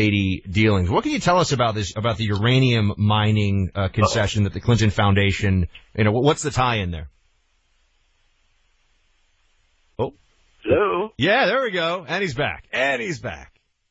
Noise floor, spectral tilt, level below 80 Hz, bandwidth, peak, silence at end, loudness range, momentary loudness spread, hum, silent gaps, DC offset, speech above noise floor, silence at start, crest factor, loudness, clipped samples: -64 dBFS; -5.5 dB/octave; -42 dBFS; 8.6 kHz; -4 dBFS; 0.45 s; 10 LU; 11 LU; none; none; under 0.1%; 44 dB; 0 s; 18 dB; -21 LUFS; under 0.1%